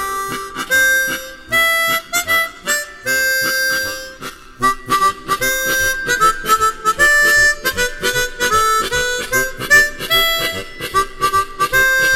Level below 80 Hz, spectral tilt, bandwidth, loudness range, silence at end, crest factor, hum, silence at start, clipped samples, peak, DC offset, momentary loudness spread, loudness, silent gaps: -36 dBFS; -1 dB/octave; 17 kHz; 3 LU; 0 s; 16 dB; none; 0 s; under 0.1%; 0 dBFS; 0.2%; 10 LU; -15 LUFS; none